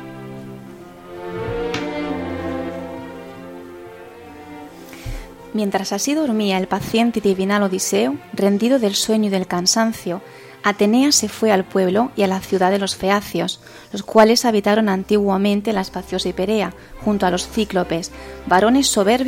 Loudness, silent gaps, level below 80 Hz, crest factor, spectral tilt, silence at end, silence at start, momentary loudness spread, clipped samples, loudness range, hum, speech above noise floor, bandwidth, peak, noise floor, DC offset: -18 LUFS; none; -44 dBFS; 20 dB; -4 dB/octave; 0 s; 0 s; 21 LU; under 0.1%; 10 LU; none; 20 dB; 16.5 kHz; 0 dBFS; -38 dBFS; under 0.1%